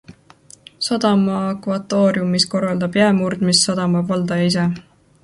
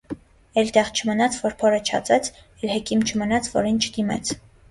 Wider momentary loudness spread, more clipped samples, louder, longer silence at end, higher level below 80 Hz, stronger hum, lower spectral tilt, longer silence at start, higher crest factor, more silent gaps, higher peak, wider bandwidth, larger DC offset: second, 7 LU vs 11 LU; neither; first, -18 LUFS vs -22 LUFS; first, 0.45 s vs 0.3 s; second, -56 dBFS vs -50 dBFS; neither; first, -5 dB/octave vs -3.5 dB/octave; about the same, 0.1 s vs 0.1 s; about the same, 18 dB vs 18 dB; neither; first, 0 dBFS vs -4 dBFS; about the same, 11.5 kHz vs 11.5 kHz; neither